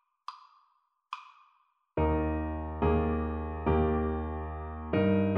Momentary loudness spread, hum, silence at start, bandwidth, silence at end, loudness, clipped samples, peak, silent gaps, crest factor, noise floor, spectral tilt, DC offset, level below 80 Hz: 17 LU; none; 0.3 s; 5.2 kHz; 0 s; -31 LUFS; under 0.1%; -14 dBFS; none; 18 dB; -72 dBFS; -10 dB/octave; under 0.1%; -38 dBFS